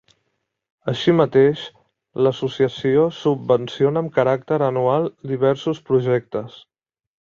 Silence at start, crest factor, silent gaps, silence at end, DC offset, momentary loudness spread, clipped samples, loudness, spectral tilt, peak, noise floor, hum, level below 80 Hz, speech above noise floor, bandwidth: 0.85 s; 18 dB; none; 0.7 s; under 0.1%; 13 LU; under 0.1%; -19 LUFS; -7.5 dB/octave; -2 dBFS; -74 dBFS; none; -60 dBFS; 55 dB; 7.2 kHz